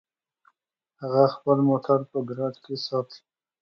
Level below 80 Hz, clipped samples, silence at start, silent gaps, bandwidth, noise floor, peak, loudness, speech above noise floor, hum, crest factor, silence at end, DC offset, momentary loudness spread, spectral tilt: -76 dBFS; under 0.1%; 1 s; none; 6.4 kHz; -77 dBFS; -6 dBFS; -25 LUFS; 53 dB; none; 20 dB; 0.45 s; under 0.1%; 11 LU; -8.5 dB/octave